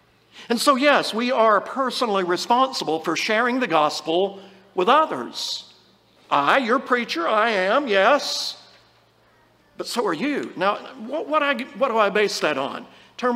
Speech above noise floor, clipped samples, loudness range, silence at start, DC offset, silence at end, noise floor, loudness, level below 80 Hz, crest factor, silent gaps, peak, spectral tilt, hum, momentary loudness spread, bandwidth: 37 dB; under 0.1%; 4 LU; 0.35 s; under 0.1%; 0 s; -58 dBFS; -21 LUFS; -74 dBFS; 18 dB; none; -4 dBFS; -3 dB/octave; none; 10 LU; 16 kHz